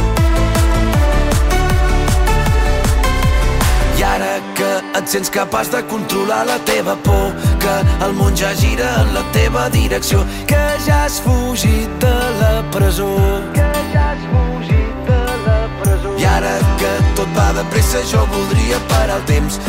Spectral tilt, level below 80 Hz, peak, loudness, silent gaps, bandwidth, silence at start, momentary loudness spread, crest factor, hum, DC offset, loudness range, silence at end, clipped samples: -5 dB/octave; -18 dBFS; -2 dBFS; -15 LUFS; none; 16.5 kHz; 0 s; 2 LU; 12 dB; none; under 0.1%; 1 LU; 0 s; under 0.1%